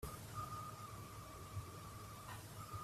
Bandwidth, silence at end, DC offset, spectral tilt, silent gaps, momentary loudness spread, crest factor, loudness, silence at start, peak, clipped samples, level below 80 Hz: 15.5 kHz; 0 s; under 0.1%; -4.5 dB/octave; none; 5 LU; 16 dB; -51 LUFS; 0 s; -34 dBFS; under 0.1%; -62 dBFS